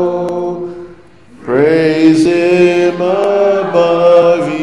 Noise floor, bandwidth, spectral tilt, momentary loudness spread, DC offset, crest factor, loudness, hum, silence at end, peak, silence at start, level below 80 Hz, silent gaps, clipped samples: -40 dBFS; 11.5 kHz; -6.5 dB/octave; 13 LU; 0.6%; 10 dB; -11 LUFS; none; 0 s; 0 dBFS; 0 s; -52 dBFS; none; under 0.1%